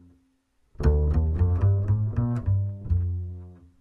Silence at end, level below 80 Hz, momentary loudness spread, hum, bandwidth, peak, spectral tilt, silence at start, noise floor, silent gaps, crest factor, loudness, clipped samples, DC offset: 0.25 s; -30 dBFS; 9 LU; none; 5.8 kHz; -10 dBFS; -10.5 dB/octave; 0.8 s; -67 dBFS; none; 16 dB; -25 LUFS; under 0.1%; under 0.1%